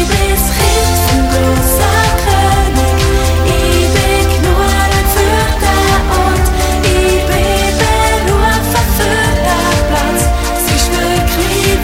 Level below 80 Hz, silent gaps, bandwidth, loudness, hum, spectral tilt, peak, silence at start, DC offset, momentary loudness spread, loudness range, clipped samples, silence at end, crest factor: -16 dBFS; none; 17 kHz; -11 LUFS; none; -4.5 dB/octave; 0 dBFS; 0 s; under 0.1%; 2 LU; 1 LU; under 0.1%; 0 s; 10 dB